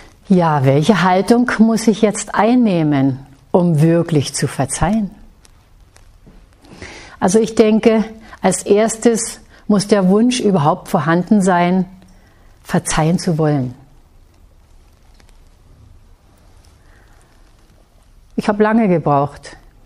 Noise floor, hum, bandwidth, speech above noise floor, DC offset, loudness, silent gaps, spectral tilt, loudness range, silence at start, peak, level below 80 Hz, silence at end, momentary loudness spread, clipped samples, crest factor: -48 dBFS; none; 15 kHz; 34 dB; under 0.1%; -15 LUFS; none; -6 dB/octave; 8 LU; 0.3 s; 0 dBFS; -40 dBFS; 0.3 s; 11 LU; under 0.1%; 16 dB